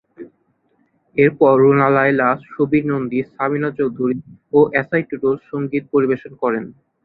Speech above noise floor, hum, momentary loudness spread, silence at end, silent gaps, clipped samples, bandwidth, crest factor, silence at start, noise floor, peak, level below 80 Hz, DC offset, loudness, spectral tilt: 46 dB; none; 10 LU; 0.35 s; none; under 0.1%; 4.6 kHz; 16 dB; 0.2 s; -63 dBFS; -2 dBFS; -58 dBFS; under 0.1%; -17 LUFS; -11 dB/octave